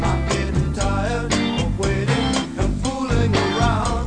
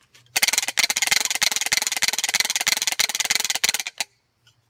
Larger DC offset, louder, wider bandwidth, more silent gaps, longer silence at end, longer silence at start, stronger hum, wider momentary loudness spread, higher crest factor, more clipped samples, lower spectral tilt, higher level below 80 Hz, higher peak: neither; about the same, -21 LUFS vs -20 LUFS; second, 10.5 kHz vs 17.5 kHz; neither; second, 0 s vs 0.65 s; second, 0 s vs 0.35 s; neither; second, 4 LU vs 7 LU; second, 14 dB vs 20 dB; neither; first, -5.5 dB/octave vs 2.5 dB/octave; first, -26 dBFS vs -62 dBFS; about the same, -4 dBFS vs -4 dBFS